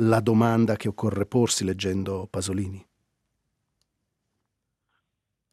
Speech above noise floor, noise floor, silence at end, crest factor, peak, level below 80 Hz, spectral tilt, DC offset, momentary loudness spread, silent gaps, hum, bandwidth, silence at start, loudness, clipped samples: 58 dB; -82 dBFS; 2.7 s; 20 dB; -6 dBFS; -64 dBFS; -5.5 dB/octave; under 0.1%; 10 LU; none; none; 15 kHz; 0 s; -25 LUFS; under 0.1%